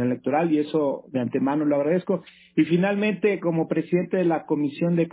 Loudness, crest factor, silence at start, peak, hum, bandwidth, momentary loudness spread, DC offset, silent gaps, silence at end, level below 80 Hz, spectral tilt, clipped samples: -24 LUFS; 14 dB; 0 s; -10 dBFS; none; 4 kHz; 5 LU; under 0.1%; none; 0.05 s; -68 dBFS; -11.5 dB/octave; under 0.1%